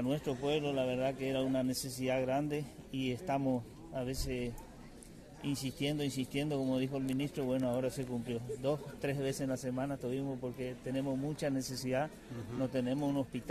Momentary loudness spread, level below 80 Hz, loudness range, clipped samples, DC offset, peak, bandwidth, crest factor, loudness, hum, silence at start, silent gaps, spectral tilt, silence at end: 8 LU; -56 dBFS; 3 LU; under 0.1%; under 0.1%; -22 dBFS; 14.5 kHz; 16 dB; -37 LUFS; none; 0 s; none; -6 dB/octave; 0 s